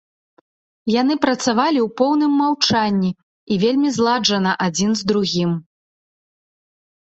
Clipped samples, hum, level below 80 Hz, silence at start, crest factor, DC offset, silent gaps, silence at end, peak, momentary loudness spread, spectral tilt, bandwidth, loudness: under 0.1%; none; -58 dBFS; 0.85 s; 18 dB; under 0.1%; 3.23-3.47 s; 1.45 s; -2 dBFS; 7 LU; -4.5 dB/octave; 8.2 kHz; -18 LUFS